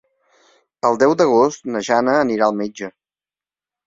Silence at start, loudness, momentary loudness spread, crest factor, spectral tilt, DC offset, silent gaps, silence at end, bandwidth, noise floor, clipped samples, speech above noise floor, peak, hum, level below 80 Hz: 0.85 s; -17 LUFS; 12 LU; 18 dB; -5 dB/octave; under 0.1%; none; 0.95 s; 7.8 kHz; under -90 dBFS; under 0.1%; over 74 dB; -2 dBFS; none; -62 dBFS